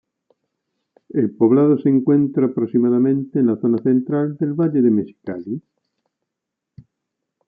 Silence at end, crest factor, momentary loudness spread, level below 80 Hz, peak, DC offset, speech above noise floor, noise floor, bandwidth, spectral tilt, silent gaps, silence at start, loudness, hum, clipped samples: 1.9 s; 16 dB; 13 LU; -68 dBFS; -4 dBFS; under 0.1%; 65 dB; -82 dBFS; 3.5 kHz; -13.5 dB/octave; none; 1.15 s; -18 LUFS; none; under 0.1%